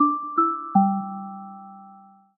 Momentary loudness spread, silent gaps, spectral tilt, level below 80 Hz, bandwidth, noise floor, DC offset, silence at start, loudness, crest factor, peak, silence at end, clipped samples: 20 LU; none; -13 dB/octave; -80 dBFS; 1.7 kHz; -50 dBFS; under 0.1%; 0 s; -23 LUFS; 18 dB; -6 dBFS; 0.4 s; under 0.1%